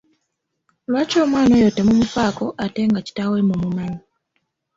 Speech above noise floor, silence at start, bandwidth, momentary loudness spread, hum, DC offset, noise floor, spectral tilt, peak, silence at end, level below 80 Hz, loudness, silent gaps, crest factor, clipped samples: 58 dB; 0.9 s; 7.8 kHz; 11 LU; none; under 0.1%; -75 dBFS; -6.5 dB/octave; -6 dBFS; 0.8 s; -48 dBFS; -18 LUFS; none; 14 dB; under 0.1%